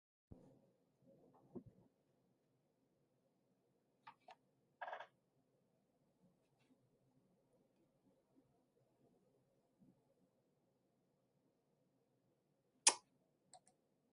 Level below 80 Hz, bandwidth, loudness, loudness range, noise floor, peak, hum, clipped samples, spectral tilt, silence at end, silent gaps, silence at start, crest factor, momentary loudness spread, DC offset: -88 dBFS; 5.2 kHz; -39 LUFS; 24 LU; -83 dBFS; -14 dBFS; none; under 0.1%; 0.5 dB/octave; 0.6 s; none; 1.55 s; 40 dB; 26 LU; under 0.1%